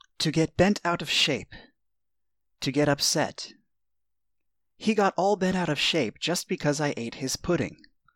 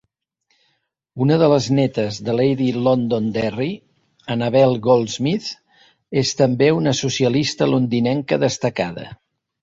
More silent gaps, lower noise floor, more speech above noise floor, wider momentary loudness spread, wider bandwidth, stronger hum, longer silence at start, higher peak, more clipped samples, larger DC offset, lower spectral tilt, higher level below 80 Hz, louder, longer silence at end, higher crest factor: neither; first, -87 dBFS vs -69 dBFS; first, 61 dB vs 51 dB; about the same, 10 LU vs 11 LU; first, 18.5 kHz vs 7.8 kHz; neither; second, 0.2 s vs 1.15 s; second, -8 dBFS vs -2 dBFS; neither; neither; second, -4 dB/octave vs -6 dB/octave; about the same, -54 dBFS vs -56 dBFS; second, -26 LUFS vs -19 LUFS; about the same, 0.4 s vs 0.5 s; about the same, 18 dB vs 18 dB